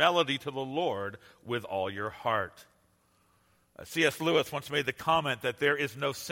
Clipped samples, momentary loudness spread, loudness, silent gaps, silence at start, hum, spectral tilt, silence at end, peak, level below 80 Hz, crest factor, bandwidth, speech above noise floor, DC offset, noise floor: under 0.1%; 9 LU; -30 LUFS; none; 0 s; none; -4 dB/octave; 0 s; -10 dBFS; -68 dBFS; 22 dB; 16.5 kHz; 38 dB; under 0.1%; -69 dBFS